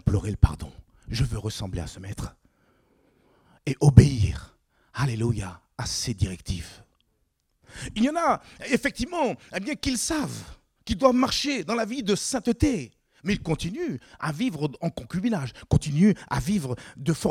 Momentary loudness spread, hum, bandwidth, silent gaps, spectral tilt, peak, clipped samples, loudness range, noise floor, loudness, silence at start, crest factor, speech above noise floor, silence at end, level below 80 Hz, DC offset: 14 LU; none; 15.5 kHz; none; -5.5 dB/octave; 0 dBFS; under 0.1%; 7 LU; -72 dBFS; -26 LUFS; 0.05 s; 26 dB; 47 dB; 0 s; -40 dBFS; under 0.1%